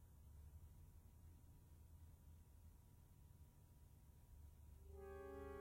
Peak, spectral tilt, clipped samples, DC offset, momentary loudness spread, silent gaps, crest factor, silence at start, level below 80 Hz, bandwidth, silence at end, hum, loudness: -44 dBFS; -7 dB/octave; under 0.1%; under 0.1%; 12 LU; none; 18 dB; 0 s; -66 dBFS; 16 kHz; 0 s; none; -64 LUFS